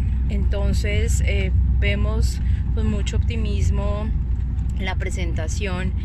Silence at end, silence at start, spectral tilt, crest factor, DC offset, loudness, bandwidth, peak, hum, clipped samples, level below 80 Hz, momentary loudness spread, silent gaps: 0 s; 0 s; -6 dB/octave; 12 dB; under 0.1%; -23 LUFS; 12 kHz; -8 dBFS; none; under 0.1%; -22 dBFS; 4 LU; none